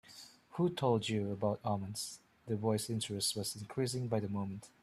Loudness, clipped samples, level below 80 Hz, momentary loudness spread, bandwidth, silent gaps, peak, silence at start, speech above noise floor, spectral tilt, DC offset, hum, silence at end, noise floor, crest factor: -37 LUFS; under 0.1%; -70 dBFS; 11 LU; 14.5 kHz; none; -18 dBFS; 0.05 s; 21 dB; -5 dB/octave; under 0.1%; none; 0.15 s; -57 dBFS; 18 dB